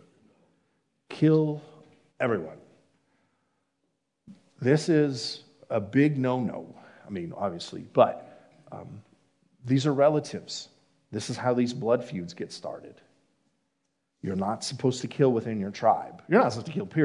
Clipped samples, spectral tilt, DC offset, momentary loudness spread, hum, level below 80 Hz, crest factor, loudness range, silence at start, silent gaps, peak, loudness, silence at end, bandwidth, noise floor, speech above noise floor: under 0.1%; -6.5 dB/octave; under 0.1%; 19 LU; none; -76 dBFS; 22 dB; 5 LU; 1.1 s; none; -6 dBFS; -27 LUFS; 0 s; 11 kHz; -78 dBFS; 52 dB